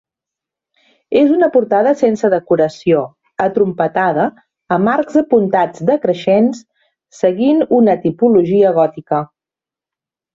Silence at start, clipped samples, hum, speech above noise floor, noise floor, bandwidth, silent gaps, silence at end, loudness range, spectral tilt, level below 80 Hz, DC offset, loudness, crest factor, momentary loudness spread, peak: 1.1 s; under 0.1%; none; 75 dB; -88 dBFS; 7.6 kHz; none; 1.1 s; 2 LU; -7.5 dB/octave; -58 dBFS; under 0.1%; -14 LUFS; 14 dB; 8 LU; 0 dBFS